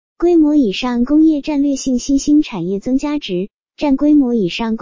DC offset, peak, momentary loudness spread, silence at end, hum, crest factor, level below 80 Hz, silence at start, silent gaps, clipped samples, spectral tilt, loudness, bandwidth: under 0.1%; -4 dBFS; 9 LU; 0.05 s; none; 10 dB; -42 dBFS; 0.2 s; none; under 0.1%; -5.5 dB/octave; -15 LUFS; 7.6 kHz